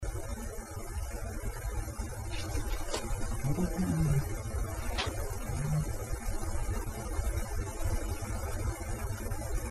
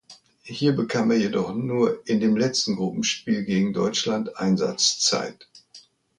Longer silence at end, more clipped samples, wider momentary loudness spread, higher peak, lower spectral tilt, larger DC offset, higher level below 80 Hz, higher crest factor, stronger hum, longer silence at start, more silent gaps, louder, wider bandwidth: second, 0 s vs 0.4 s; neither; about the same, 8 LU vs 6 LU; second, -18 dBFS vs -6 dBFS; first, -5.5 dB/octave vs -4 dB/octave; neither; first, -36 dBFS vs -64 dBFS; about the same, 16 dB vs 18 dB; neither; about the same, 0 s vs 0.1 s; neither; second, -36 LUFS vs -23 LUFS; first, 14 kHz vs 11 kHz